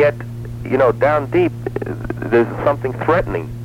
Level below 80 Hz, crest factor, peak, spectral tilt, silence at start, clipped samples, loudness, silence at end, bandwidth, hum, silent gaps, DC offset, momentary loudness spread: -38 dBFS; 16 dB; -2 dBFS; -8.5 dB/octave; 0 s; under 0.1%; -18 LUFS; 0 s; 15.5 kHz; none; none; under 0.1%; 10 LU